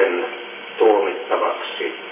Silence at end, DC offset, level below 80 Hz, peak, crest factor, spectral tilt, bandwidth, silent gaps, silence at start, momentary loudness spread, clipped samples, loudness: 0 s; under 0.1%; under -90 dBFS; -4 dBFS; 16 dB; -6.5 dB/octave; 3.8 kHz; none; 0 s; 13 LU; under 0.1%; -20 LUFS